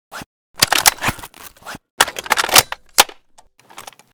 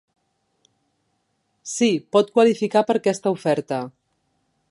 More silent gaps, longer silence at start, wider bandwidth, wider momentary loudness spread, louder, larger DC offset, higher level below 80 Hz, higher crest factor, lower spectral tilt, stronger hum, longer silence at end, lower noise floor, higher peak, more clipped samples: first, 0.26-0.54 s, 1.90-1.98 s vs none; second, 0.15 s vs 1.65 s; first, over 20 kHz vs 11.5 kHz; first, 24 LU vs 12 LU; first, -14 LUFS vs -20 LUFS; neither; first, -46 dBFS vs -74 dBFS; about the same, 20 dB vs 18 dB; second, 0 dB/octave vs -5 dB/octave; neither; second, 0.35 s vs 0.8 s; second, -51 dBFS vs -71 dBFS; first, 0 dBFS vs -4 dBFS; first, 0.5% vs under 0.1%